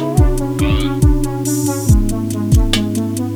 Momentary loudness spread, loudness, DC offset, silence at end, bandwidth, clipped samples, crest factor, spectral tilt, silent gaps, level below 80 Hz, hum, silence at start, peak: 5 LU; -16 LUFS; under 0.1%; 0 s; 20 kHz; under 0.1%; 14 dB; -6 dB/octave; none; -18 dBFS; none; 0 s; 0 dBFS